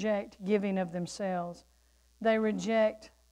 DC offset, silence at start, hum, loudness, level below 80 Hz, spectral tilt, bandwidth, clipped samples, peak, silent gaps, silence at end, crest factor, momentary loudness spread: under 0.1%; 0 s; none; -31 LUFS; -66 dBFS; -6 dB/octave; 11.5 kHz; under 0.1%; -16 dBFS; none; 0.25 s; 16 dB; 11 LU